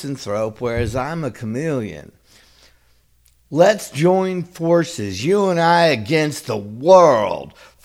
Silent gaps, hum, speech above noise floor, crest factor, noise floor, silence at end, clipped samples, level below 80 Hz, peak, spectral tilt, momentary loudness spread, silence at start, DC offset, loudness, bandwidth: none; none; 39 dB; 18 dB; -56 dBFS; 0.35 s; under 0.1%; -46 dBFS; 0 dBFS; -5.5 dB/octave; 13 LU; 0 s; under 0.1%; -18 LUFS; 15.5 kHz